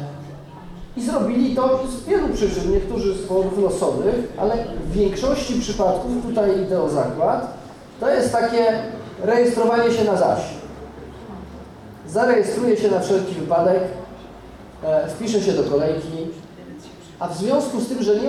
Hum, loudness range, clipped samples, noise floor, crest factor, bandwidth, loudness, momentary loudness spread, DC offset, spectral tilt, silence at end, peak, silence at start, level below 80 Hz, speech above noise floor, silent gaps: none; 3 LU; under 0.1%; -40 dBFS; 14 dB; 13.5 kHz; -20 LUFS; 20 LU; under 0.1%; -6 dB/octave; 0 s; -6 dBFS; 0 s; -38 dBFS; 20 dB; none